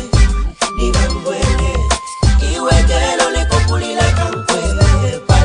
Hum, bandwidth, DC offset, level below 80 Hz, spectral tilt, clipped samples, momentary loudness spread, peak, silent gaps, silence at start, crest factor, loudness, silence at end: none; 10.5 kHz; under 0.1%; -16 dBFS; -4.5 dB/octave; under 0.1%; 4 LU; 0 dBFS; none; 0 s; 12 dB; -15 LUFS; 0 s